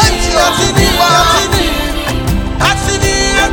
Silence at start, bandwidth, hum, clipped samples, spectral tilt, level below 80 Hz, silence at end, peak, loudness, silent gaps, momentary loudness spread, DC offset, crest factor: 0 s; over 20 kHz; none; 0.4%; -3.5 dB/octave; -20 dBFS; 0 s; 0 dBFS; -11 LUFS; none; 7 LU; under 0.1%; 10 dB